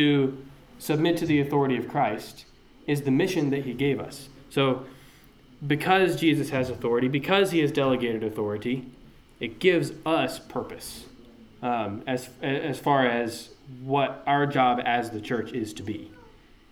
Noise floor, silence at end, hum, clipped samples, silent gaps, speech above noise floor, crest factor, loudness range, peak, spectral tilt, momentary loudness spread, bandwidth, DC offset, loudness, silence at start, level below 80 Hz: -53 dBFS; 0.5 s; none; under 0.1%; none; 28 dB; 18 dB; 4 LU; -8 dBFS; -6 dB/octave; 15 LU; 18 kHz; under 0.1%; -26 LUFS; 0 s; -58 dBFS